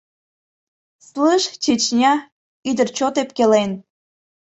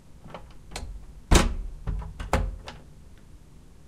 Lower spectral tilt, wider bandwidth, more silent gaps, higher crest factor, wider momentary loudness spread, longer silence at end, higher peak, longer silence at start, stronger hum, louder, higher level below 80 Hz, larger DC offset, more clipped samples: about the same, -3.5 dB/octave vs -4.5 dB/octave; second, 8.2 kHz vs 16 kHz; first, 2.32-2.63 s vs none; second, 18 dB vs 26 dB; second, 11 LU vs 23 LU; first, 0.7 s vs 0.5 s; about the same, -2 dBFS vs -2 dBFS; first, 1.15 s vs 0.15 s; neither; first, -18 LUFS vs -28 LUFS; second, -62 dBFS vs -32 dBFS; second, under 0.1% vs 0.2%; neither